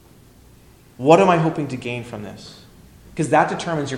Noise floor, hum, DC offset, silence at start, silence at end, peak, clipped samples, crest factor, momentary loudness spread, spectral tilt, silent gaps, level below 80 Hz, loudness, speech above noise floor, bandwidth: -49 dBFS; none; under 0.1%; 1 s; 0 s; 0 dBFS; under 0.1%; 20 dB; 22 LU; -6 dB/octave; none; -52 dBFS; -19 LUFS; 30 dB; 14 kHz